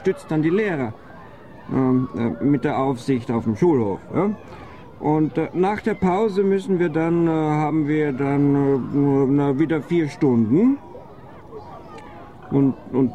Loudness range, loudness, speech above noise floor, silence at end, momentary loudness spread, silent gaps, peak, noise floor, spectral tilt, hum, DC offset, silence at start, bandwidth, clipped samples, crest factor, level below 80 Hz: 3 LU; -21 LUFS; 22 dB; 0 s; 21 LU; none; -8 dBFS; -42 dBFS; -9 dB/octave; none; 0.4%; 0 s; 9.6 kHz; under 0.1%; 14 dB; -52 dBFS